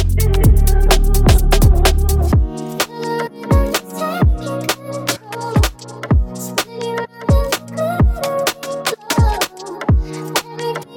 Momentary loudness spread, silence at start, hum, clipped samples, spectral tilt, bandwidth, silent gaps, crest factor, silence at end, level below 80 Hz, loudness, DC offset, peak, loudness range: 9 LU; 0 s; none; under 0.1%; -5 dB/octave; 19.5 kHz; none; 12 dB; 0 s; -18 dBFS; -17 LUFS; under 0.1%; -2 dBFS; 4 LU